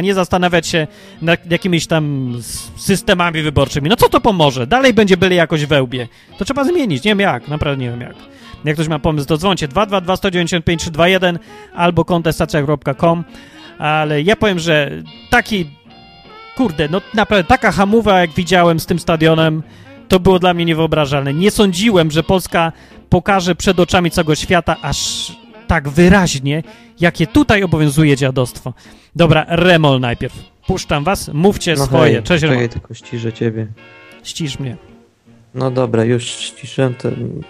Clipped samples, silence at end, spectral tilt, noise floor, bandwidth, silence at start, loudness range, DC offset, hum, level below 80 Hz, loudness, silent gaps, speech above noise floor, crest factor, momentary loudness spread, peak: under 0.1%; 0.05 s; -5.5 dB/octave; -47 dBFS; 15.5 kHz; 0 s; 4 LU; under 0.1%; none; -34 dBFS; -14 LUFS; none; 33 dB; 14 dB; 12 LU; 0 dBFS